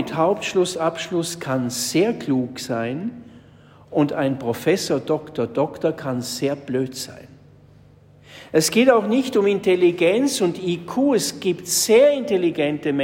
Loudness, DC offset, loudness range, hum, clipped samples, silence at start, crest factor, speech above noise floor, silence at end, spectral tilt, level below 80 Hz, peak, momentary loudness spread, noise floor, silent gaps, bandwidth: -20 LUFS; under 0.1%; 6 LU; none; under 0.1%; 0 s; 16 dB; 29 dB; 0 s; -4.5 dB/octave; -62 dBFS; -4 dBFS; 10 LU; -49 dBFS; none; 16.5 kHz